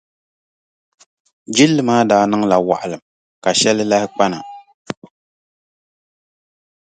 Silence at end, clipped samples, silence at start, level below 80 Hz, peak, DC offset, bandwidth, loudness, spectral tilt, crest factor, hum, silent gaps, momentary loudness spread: 1.95 s; under 0.1%; 1.5 s; -60 dBFS; 0 dBFS; under 0.1%; 9.4 kHz; -15 LUFS; -4 dB/octave; 18 dB; none; 3.02-3.42 s, 4.74-4.85 s; 18 LU